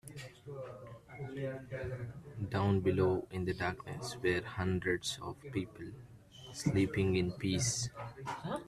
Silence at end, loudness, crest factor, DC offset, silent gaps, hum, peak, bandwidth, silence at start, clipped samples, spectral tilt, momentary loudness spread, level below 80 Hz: 0 s; -36 LUFS; 18 dB; under 0.1%; none; none; -18 dBFS; 13.5 kHz; 0.05 s; under 0.1%; -5 dB/octave; 17 LU; -60 dBFS